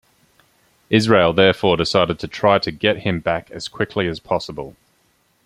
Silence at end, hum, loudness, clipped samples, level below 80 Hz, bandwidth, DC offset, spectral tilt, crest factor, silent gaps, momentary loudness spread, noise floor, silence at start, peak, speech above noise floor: 0.75 s; none; -18 LUFS; under 0.1%; -50 dBFS; 14 kHz; under 0.1%; -5.5 dB/octave; 18 dB; none; 11 LU; -62 dBFS; 0.9 s; 0 dBFS; 44 dB